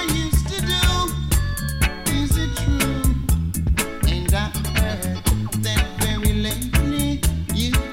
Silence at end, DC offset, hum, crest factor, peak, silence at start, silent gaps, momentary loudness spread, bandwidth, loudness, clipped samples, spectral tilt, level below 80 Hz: 0 s; under 0.1%; none; 18 dB; -2 dBFS; 0 s; none; 3 LU; 17 kHz; -21 LUFS; under 0.1%; -4.5 dB/octave; -24 dBFS